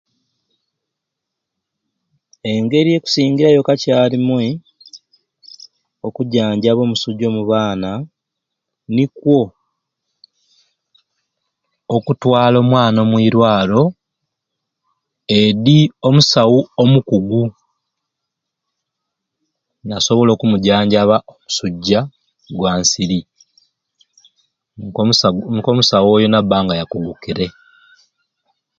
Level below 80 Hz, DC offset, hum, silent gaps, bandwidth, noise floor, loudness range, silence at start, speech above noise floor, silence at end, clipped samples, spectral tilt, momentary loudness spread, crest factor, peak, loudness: -50 dBFS; under 0.1%; none; none; 7.8 kHz; -80 dBFS; 7 LU; 2.45 s; 66 dB; 1.3 s; under 0.1%; -5.5 dB/octave; 12 LU; 16 dB; 0 dBFS; -14 LUFS